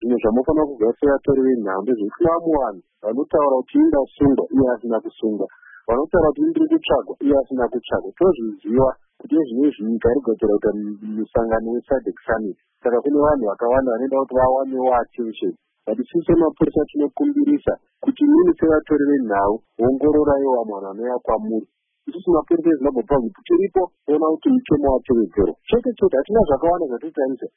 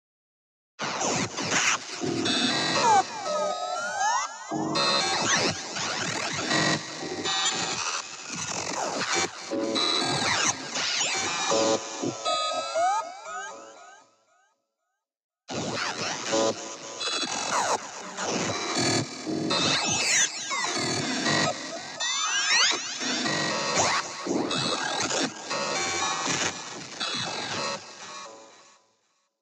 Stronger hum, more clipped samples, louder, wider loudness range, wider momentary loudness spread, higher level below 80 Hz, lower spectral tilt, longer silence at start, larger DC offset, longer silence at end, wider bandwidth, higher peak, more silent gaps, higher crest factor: neither; neither; first, -19 LUFS vs -26 LUFS; second, 3 LU vs 6 LU; about the same, 9 LU vs 10 LU; first, -42 dBFS vs -70 dBFS; first, -12 dB/octave vs -1.5 dB/octave; second, 0 s vs 0.8 s; neither; second, 0.1 s vs 0.8 s; second, 3.7 kHz vs 15.5 kHz; first, -6 dBFS vs -10 dBFS; second, none vs 15.24-15.29 s; about the same, 14 dB vs 18 dB